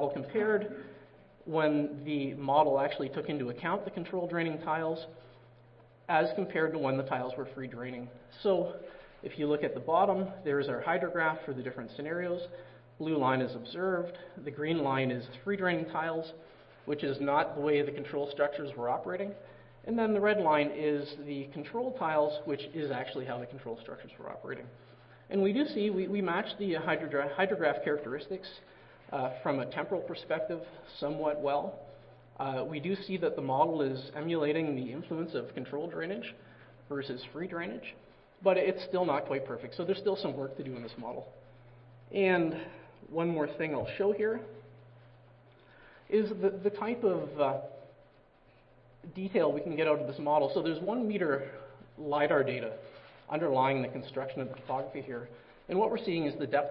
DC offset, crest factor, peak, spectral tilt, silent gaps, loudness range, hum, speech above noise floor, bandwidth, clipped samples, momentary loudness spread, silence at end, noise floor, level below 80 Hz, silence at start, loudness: under 0.1%; 22 dB; -12 dBFS; -10 dB/octave; none; 4 LU; none; 30 dB; 5.8 kHz; under 0.1%; 15 LU; 0 s; -62 dBFS; -68 dBFS; 0 s; -33 LUFS